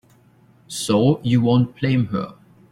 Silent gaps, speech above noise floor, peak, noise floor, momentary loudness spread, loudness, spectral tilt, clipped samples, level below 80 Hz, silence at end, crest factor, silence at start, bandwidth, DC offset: none; 35 dB; -4 dBFS; -54 dBFS; 12 LU; -19 LUFS; -6.5 dB/octave; under 0.1%; -54 dBFS; 0.4 s; 16 dB; 0.7 s; 15 kHz; under 0.1%